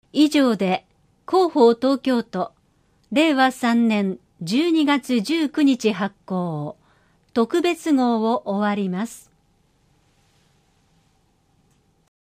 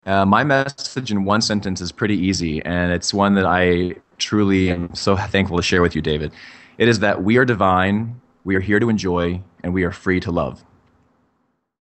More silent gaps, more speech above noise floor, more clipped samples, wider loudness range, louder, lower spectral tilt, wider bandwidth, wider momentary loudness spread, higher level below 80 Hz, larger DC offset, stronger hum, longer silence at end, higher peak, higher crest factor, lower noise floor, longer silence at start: neither; second, 43 dB vs 49 dB; neither; first, 7 LU vs 3 LU; about the same, -20 LUFS vs -19 LUFS; about the same, -5.5 dB/octave vs -5.5 dB/octave; first, 15.5 kHz vs 8.8 kHz; about the same, 11 LU vs 9 LU; second, -66 dBFS vs -42 dBFS; neither; neither; first, 3 s vs 1.25 s; about the same, -4 dBFS vs -2 dBFS; about the same, 16 dB vs 18 dB; second, -62 dBFS vs -68 dBFS; about the same, 0.15 s vs 0.05 s